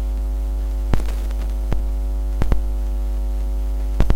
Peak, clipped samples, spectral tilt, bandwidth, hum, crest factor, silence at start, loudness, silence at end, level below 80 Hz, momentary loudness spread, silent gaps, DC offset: -2 dBFS; under 0.1%; -7 dB/octave; 9.8 kHz; none; 18 dB; 0 s; -25 LUFS; 0 s; -20 dBFS; 2 LU; none; under 0.1%